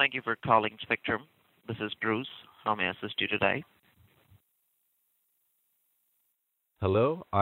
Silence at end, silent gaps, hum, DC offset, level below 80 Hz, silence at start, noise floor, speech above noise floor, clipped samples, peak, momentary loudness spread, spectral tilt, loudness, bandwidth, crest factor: 0 s; none; none; under 0.1%; -64 dBFS; 0 s; -79 dBFS; 49 dB; under 0.1%; -8 dBFS; 10 LU; -7.5 dB/octave; -30 LUFS; 16 kHz; 24 dB